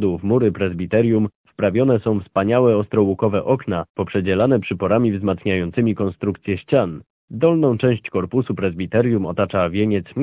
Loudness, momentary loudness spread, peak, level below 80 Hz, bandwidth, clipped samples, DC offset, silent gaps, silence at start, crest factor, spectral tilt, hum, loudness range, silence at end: -19 LUFS; 7 LU; -2 dBFS; -44 dBFS; 4 kHz; under 0.1%; under 0.1%; 1.35-1.44 s, 3.90-3.95 s, 7.10-7.28 s; 0 s; 16 dB; -12 dB/octave; none; 2 LU; 0 s